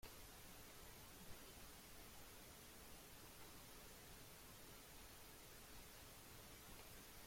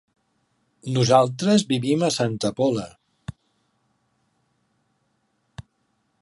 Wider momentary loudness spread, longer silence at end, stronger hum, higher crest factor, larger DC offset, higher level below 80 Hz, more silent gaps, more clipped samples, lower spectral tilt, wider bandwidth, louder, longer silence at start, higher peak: second, 1 LU vs 23 LU; second, 0 s vs 0.6 s; neither; second, 16 dB vs 22 dB; neither; second, -68 dBFS vs -58 dBFS; neither; neither; second, -2.5 dB/octave vs -5.5 dB/octave; first, 16.5 kHz vs 11.5 kHz; second, -60 LUFS vs -21 LUFS; second, 0 s vs 0.85 s; second, -44 dBFS vs -4 dBFS